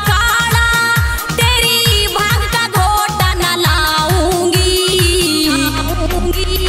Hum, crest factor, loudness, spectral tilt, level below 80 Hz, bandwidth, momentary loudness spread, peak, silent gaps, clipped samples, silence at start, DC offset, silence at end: none; 12 dB; -12 LUFS; -3.5 dB/octave; -22 dBFS; 16.5 kHz; 6 LU; 0 dBFS; none; under 0.1%; 0 s; under 0.1%; 0 s